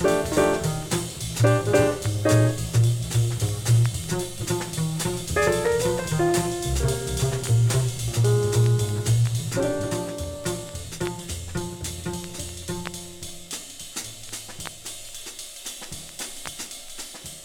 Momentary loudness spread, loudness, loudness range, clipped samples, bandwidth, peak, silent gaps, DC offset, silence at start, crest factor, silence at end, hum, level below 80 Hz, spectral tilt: 14 LU; -25 LUFS; 12 LU; under 0.1%; 17 kHz; -8 dBFS; none; under 0.1%; 0 s; 18 dB; 0 s; none; -42 dBFS; -5 dB/octave